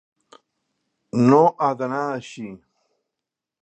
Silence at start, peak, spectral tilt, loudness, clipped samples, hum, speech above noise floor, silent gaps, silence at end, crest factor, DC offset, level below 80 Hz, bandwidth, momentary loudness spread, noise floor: 1.15 s; -2 dBFS; -7.5 dB/octave; -20 LUFS; under 0.1%; none; 66 dB; none; 1.05 s; 22 dB; under 0.1%; -70 dBFS; 8.6 kHz; 21 LU; -85 dBFS